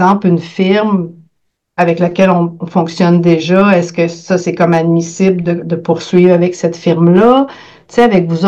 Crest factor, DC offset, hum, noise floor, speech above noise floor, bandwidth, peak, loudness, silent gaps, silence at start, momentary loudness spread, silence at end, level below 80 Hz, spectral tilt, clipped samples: 10 dB; under 0.1%; none; -65 dBFS; 55 dB; 7.8 kHz; 0 dBFS; -11 LUFS; none; 0 s; 7 LU; 0 s; -52 dBFS; -7 dB/octave; under 0.1%